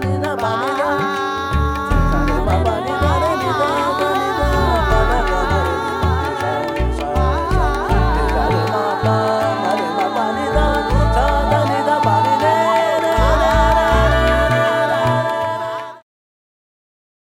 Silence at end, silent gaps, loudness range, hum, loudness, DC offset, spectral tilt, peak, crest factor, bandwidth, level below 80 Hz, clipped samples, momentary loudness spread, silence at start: 1.25 s; none; 3 LU; none; -17 LUFS; under 0.1%; -6 dB/octave; 0 dBFS; 16 dB; 16 kHz; -24 dBFS; under 0.1%; 5 LU; 0 s